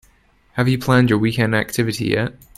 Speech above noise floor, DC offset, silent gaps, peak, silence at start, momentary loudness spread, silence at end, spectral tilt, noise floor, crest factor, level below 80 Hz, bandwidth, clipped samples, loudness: 38 dB; under 0.1%; none; 0 dBFS; 0.55 s; 6 LU; 0.25 s; -6 dB/octave; -56 dBFS; 18 dB; -46 dBFS; 14.5 kHz; under 0.1%; -18 LUFS